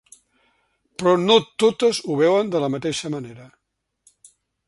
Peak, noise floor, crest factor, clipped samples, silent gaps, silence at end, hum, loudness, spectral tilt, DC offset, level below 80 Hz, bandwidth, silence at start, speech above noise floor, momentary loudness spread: -2 dBFS; -66 dBFS; 20 dB; under 0.1%; none; 1.2 s; none; -20 LUFS; -4.5 dB/octave; under 0.1%; -64 dBFS; 11.5 kHz; 1 s; 47 dB; 14 LU